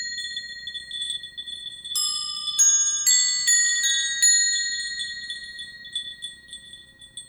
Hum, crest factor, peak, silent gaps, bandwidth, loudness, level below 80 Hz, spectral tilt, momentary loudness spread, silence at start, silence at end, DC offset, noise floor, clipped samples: none; 18 dB; -8 dBFS; none; over 20 kHz; -20 LUFS; -64 dBFS; 4.5 dB/octave; 19 LU; 0 s; 0.05 s; under 0.1%; -46 dBFS; under 0.1%